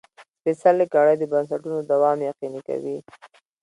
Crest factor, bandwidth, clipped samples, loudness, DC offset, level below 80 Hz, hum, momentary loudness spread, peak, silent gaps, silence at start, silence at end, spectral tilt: 18 dB; 11 kHz; under 0.1%; -22 LUFS; under 0.1%; -74 dBFS; none; 12 LU; -4 dBFS; 0.28-0.34 s; 0.2 s; 0.35 s; -7.5 dB/octave